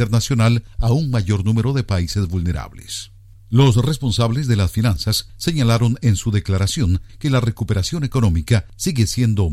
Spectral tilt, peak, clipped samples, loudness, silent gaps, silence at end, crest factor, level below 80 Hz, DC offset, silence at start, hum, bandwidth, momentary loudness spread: -6 dB/octave; -4 dBFS; under 0.1%; -19 LUFS; none; 0 s; 14 dB; -32 dBFS; under 0.1%; 0 s; none; 15 kHz; 6 LU